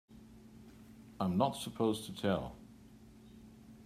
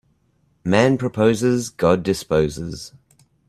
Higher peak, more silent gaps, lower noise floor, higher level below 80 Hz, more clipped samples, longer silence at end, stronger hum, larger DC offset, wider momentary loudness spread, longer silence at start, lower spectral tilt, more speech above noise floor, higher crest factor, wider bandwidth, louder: second, -16 dBFS vs 0 dBFS; neither; second, -57 dBFS vs -63 dBFS; second, -64 dBFS vs -48 dBFS; neither; second, 0 s vs 0.6 s; neither; neither; first, 24 LU vs 14 LU; second, 0.1 s vs 0.65 s; about the same, -6 dB/octave vs -6 dB/octave; second, 23 dB vs 44 dB; about the same, 22 dB vs 20 dB; about the same, 15.5 kHz vs 14.5 kHz; second, -36 LUFS vs -19 LUFS